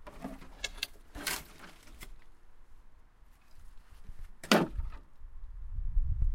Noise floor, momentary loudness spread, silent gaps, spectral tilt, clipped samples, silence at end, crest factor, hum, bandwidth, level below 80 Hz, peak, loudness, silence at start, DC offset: -57 dBFS; 26 LU; none; -4 dB/octave; under 0.1%; 0 s; 30 dB; none; 16.5 kHz; -40 dBFS; -6 dBFS; -35 LUFS; 0 s; under 0.1%